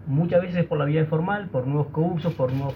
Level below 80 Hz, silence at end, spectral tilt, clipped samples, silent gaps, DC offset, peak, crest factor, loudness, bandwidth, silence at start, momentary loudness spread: -54 dBFS; 0 s; -10 dB/octave; under 0.1%; none; under 0.1%; -8 dBFS; 16 dB; -24 LUFS; 5.2 kHz; 0 s; 4 LU